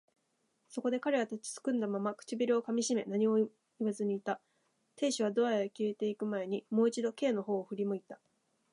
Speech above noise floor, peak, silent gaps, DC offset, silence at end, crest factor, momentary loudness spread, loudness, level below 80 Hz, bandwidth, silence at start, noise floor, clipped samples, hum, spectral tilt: 45 dB; -18 dBFS; none; under 0.1%; 0.6 s; 16 dB; 7 LU; -34 LUFS; -88 dBFS; 11 kHz; 0.7 s; -78 dBFS; under 0.1%; none; -5 dB/octave